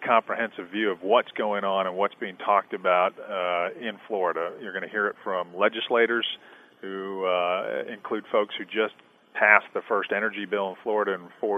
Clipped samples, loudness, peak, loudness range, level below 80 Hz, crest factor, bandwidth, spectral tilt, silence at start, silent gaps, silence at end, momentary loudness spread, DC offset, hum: under 0.1%; -26 LUFS; 0 dBFS; 3 LU; -84 dBFS; 26 dB; 6.2 kHz; -6 dB/octave; 0 s; none; 0 s; 9 LU; under 0.1%; none